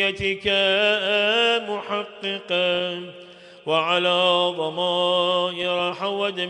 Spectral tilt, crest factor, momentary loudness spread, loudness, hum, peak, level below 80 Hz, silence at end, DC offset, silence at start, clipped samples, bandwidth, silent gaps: -4 dB/octave; 16 dB; 10 LU; -21 LUFS; none; -6 dBFS; -58 dBFS; 0 s; under 0.1%; 0 s; under 0.1%; 10.5 kHz; none